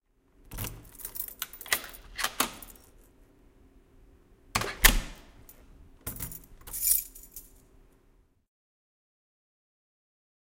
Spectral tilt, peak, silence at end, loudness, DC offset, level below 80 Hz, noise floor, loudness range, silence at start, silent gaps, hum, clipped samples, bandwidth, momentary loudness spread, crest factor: -1 dB/octave; -2 dBFS; 3.05 s; -29 LUFS; under 0.1%; -42 dBFS; -64 dBFS; 6 LU; 0.5 s; none; none; under 0.1%; 17 kHz; 23 LU; 34 dB